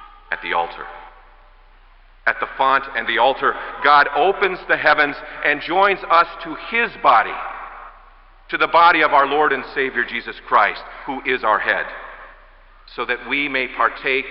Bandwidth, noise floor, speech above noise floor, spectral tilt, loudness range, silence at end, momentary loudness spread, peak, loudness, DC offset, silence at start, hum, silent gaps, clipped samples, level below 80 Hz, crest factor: 5.8 kHz; -48 dBFS; 29 dB; -7.5 dB/octave; 5 LU; 0 s; 16 LU; -2 dBFS; -18 LUFS; under 0.1%; 0 s; none; none; under 0.1%; -48 dBFS; 18 dB